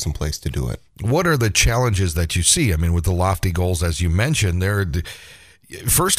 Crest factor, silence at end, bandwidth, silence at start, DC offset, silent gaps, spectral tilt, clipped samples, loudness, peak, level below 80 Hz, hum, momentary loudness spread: 18 dB; 0 s; 16 kHz; 0 s; 0.2%; none; -4 dB/octave; under 0.1%; -19 LUFS; -2 dBFS; -30 dBFS; none; 11 LU